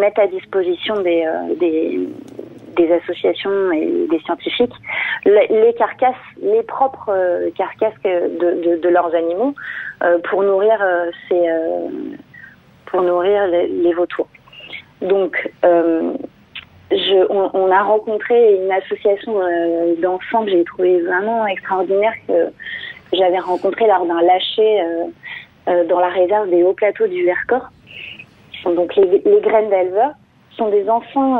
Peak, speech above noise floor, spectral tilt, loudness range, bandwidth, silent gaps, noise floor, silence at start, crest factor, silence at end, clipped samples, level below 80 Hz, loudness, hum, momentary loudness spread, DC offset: -2 dBFS; 27 dB; -7 dB/octave; 3 LU; 4.3 kHz; none; -43 dBFS; 0 s; 14 dB; 0 s; under 0.1%; -62 dBFS; -16 LUFS; none; 13 LU; under 0.1%